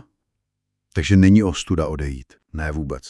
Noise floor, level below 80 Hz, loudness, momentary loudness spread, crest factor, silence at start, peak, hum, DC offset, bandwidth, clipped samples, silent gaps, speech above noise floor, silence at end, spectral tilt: -78 dBFS; -36 dBFS; -19 LUFS; 17 LU; 18 dB; 0.95 s; -2 dBFS; 50 Hz at -40 dBFS; under 0.1%; 11 kHz; under 0.1%; none; 60 dB; 0 s; -6.5 dB/octave